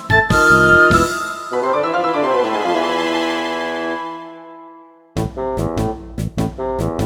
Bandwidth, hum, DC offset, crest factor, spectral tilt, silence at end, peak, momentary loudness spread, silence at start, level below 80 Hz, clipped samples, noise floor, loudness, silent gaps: 20 kHz; none; under 0.1%; 18 dB; -5 dB/octave; 0 s; 0 dBFS; 15 LU; 0 s; -36 dBFS; under 0.1%; -43 dBFS; -16 LUFS; none